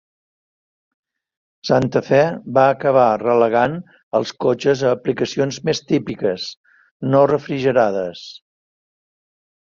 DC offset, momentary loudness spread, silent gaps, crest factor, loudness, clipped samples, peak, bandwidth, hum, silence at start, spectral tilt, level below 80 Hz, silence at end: under 0.1%; 13 LU; 4.03-4.11 s, 6.57-6.64 s, 6.91-7.00 s; 18 dB; -18 LUFS; under 0.1%; -2 dBFS; 7.4 kHz; none; 1.65 s; -6 dB/octave; -58 dBFS; 1.25 s